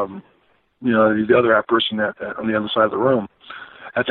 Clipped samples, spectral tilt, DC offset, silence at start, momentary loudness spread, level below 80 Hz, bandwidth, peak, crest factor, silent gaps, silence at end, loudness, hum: under 0.1%; -10 dB/octave; under 0.1%; 0 s; 20 LU; -58 dBFS; 4.3 kHz; -4 dBFS; 16 dB; none; 0 s; -19 LUFS; none